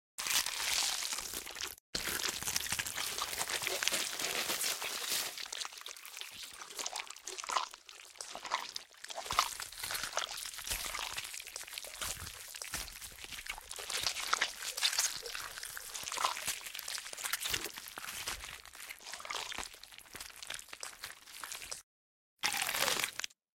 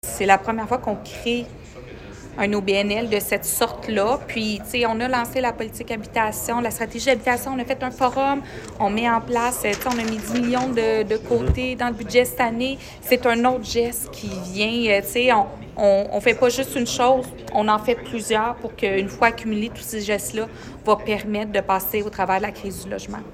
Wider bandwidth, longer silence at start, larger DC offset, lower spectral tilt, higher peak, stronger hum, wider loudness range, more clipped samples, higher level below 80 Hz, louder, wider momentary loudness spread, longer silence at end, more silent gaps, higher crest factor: about the same, 17 kHz vs 16 kHz; first, 0.2 s vs 0.05 s; neither; second, 0.5 dB/octave vs -4 dB/octave; second, -8 dBFS vs 0 dBFS; neither; first, 7 LU vs 4 LU; neither; second, -64 dBFS vs -42 dBFS; second, -37 LUFS vs -22 LUFS; first, 13 LU vs 10 LU; first, 0.3 s vs 0 s; first, 1.80-1.93 s, 21.83-22.37 s vs none; first, 32 dB vs 22 dB